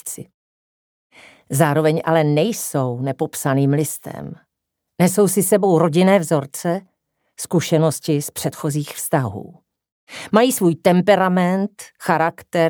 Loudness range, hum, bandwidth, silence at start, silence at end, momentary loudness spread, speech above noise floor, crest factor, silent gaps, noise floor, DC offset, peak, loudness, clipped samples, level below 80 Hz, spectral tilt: 4 LU; none; over 20 kHz; 0.05 s; 0 s; 13 LU; 61 dB; 18 dB; 0.34-1.10 s, 9.92-10.07 s; -79 dBFS; under 0.1%; 0 dBFS; -18 LUFS; under 0.1%; -64 dBFS; -5.5 dB/octave